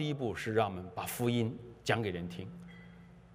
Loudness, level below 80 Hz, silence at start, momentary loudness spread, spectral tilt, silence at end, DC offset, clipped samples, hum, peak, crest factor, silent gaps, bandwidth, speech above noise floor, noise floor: -35 LUFS; -64 dBFS; 0 s; 18 LU; -5.5 dB/octave; 0 s; under 0.1%; under 0.1%; none; -14 dBFS; 22 dB; none; 16 kHz; 20 dB; -55 dBFS